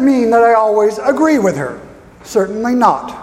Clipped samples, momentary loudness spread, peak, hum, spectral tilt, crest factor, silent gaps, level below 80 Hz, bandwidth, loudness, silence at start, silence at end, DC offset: under 0.1%; 10 LU; 0 dBFS; none; -6 dB/octave; 12 dB; none; -50 dBFS; 15.5 kHz; -13 LUFS; 0 s; 0 s; under 0.1%